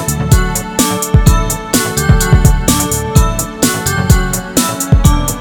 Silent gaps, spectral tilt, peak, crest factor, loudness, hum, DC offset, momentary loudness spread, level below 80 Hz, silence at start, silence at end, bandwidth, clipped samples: none; -4.5 dB/octave; 0 dBFS; 12 dB; -12 LUFS; none; under 0.1%; 4 LU; -16 dBFS; 0 s; 0 s; over 20 kHz; 0.8%